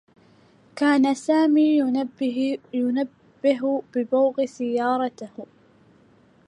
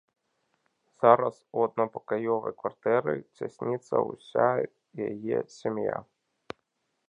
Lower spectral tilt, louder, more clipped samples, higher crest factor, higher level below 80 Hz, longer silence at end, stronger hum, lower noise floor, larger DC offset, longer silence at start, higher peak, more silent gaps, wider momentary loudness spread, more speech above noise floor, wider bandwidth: second, -5 dB/octave vs -7.5 dB/octave; first, -22 LUFS vs -29 LUFS; neither; second, 16 dB vs 26 dB; about the same, -76 dBFS vs -74 dBFS; about the same, 1.05 s vs 1.05 s; neither; second, -56 dBFS vs -78 dBFS; neither; second, 0.75 s vs 1 s; second, -8 dBFS vs -4 dBFS; neither; second, 11 LU vs 14 LU; second, 35 dB vs 50 dB; first, 10.5 kHz vs 9.4 kHz